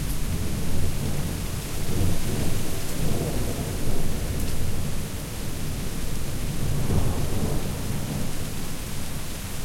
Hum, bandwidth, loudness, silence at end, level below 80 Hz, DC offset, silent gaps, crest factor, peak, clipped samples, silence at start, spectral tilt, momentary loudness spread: none; 16.5 kHz; -29 LUFS; 0 s; -30 dBFS; under 0.1%; none; 14 dB; -10 dBFS; under 0.1%; 0 s; -5 dB/octave; 6 LU